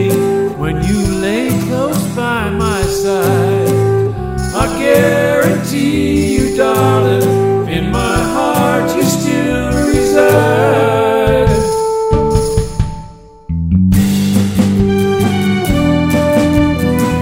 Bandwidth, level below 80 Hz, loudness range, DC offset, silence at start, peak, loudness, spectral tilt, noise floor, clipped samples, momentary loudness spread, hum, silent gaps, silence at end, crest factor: 16.5 kHz; -26 dBFS; 2 LU; under 0.1%; 0 s; 0 dBFS; -13 LUFS; -6 dB/octave; -33 dBFS; under 0.1%; 5 LU; none; none; 0 s; 12 dB